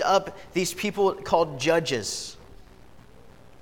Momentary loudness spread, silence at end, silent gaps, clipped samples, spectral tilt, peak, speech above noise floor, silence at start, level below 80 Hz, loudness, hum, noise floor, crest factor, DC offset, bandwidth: 8 LU; 1.2 s; none; under 0.1%; -3.5 dB/octave; -6 dBFS; 26 dB; 0 s; -54 dBFS; -25 LUFS; 60 Hz at -55 dBFS; -51 dBFS; 20 dB; 0.3%; 18 kHz